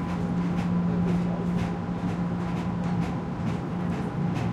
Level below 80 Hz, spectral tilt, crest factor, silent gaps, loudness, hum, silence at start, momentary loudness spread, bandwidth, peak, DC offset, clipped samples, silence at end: -46 dBFS; -8.5 dB/octave; 12 dB; none; -28 LUFS; none; 0 s; 4 LU; 8.2 kHz; -16 dBFS; under 0.1%; under 0.1%; 0 s